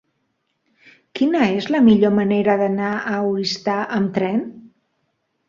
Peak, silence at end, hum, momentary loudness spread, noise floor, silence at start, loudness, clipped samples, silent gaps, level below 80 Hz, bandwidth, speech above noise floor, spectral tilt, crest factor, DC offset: -2 dBFS; 0.8 s; none; 8 LU; -71 dBFS; 1.15 s; -18 LUFS; under 0.1%; none; -60 dBFS; 7.4 kHz; 53 dB; -6.5 dB/octave; 18 dB; under 0.1%